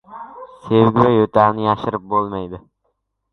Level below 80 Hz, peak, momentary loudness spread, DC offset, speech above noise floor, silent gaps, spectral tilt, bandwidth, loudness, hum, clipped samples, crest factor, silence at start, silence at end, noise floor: -50 dBFS; 0 dBFS; 23 LU; under 0.1%; 55 dB; none; -9.5 dB/octave; 6.2 kHz; -16 LUFS; none; under 0.1%; 18 dB; 0.1 s; 0.75 s; -70 dBFS